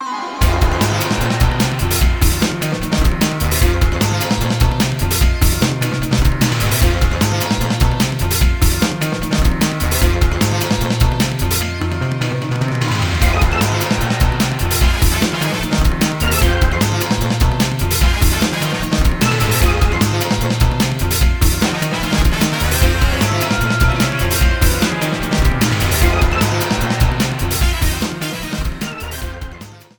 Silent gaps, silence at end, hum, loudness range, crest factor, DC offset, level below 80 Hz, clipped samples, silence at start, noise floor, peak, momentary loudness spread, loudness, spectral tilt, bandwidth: none; 0.2 s; none; 2 LU; 14 dB; under 0.1%; -20 dBFS; under 0.1%; 0 s; -35 dBFS; 0 dBFS; 4 LU; -16 LUFS; -4.5 dB/octave; over 20 kHz